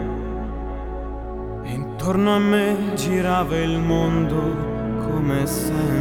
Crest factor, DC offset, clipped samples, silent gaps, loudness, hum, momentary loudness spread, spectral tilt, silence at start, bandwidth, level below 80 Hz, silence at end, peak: 16 dB; under 0.1%; under 0.1%; none; -22 LUFS; none; 12 LU; -6.5 dB/octave; 0 s; 20 kHz; -34 dBFS; 0 s; -6 dBFS